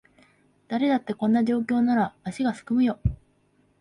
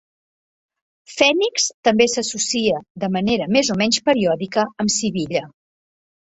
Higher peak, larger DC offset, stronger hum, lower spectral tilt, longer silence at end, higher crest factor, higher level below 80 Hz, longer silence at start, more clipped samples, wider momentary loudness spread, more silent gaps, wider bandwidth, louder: second, -12 dBFS vs 0 dBFS; neither; neither; first, -7.5 dB/octave vs -3 dB/octave; second, 0.65 s vs 0.9 s; second, 14 dB vs 20 dB; first, -44 dBFS vs -56 dBFS; second, 0.7 s vs 1.1 s; neither; about the same, 8 LU vs 8 LU; second, none vs 1.74-1.83 s, 2.90-2.95 s; first, 11 kHz vs 8.4 kHz; second, -25 LUFS vs -19 LUFS